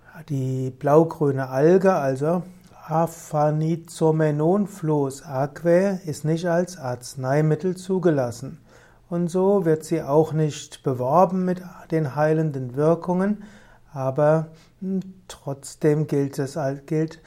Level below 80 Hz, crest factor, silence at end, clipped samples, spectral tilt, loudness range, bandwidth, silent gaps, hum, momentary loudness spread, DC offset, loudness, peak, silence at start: -58 dBFS; 20 dB; 0.1 s; under 0.1%; -7.5 dB/octave; 3 LU; 15 kHz; none; none; 12 LU; under 0.1%; -23 LUFS; -4 dBFS; 0.15 s